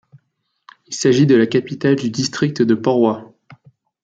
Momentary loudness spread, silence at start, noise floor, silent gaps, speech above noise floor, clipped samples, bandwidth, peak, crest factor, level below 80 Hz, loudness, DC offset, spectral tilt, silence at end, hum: 7 LU; 0.9 s; -70 dBFS; none; 54 dB; under 0.1%; 9.2 kHz; -2 dBFS; 16 dB; -60 dBFS; -16 LUFS; under 0.1%; -6 dB/octave; 0.8 s; none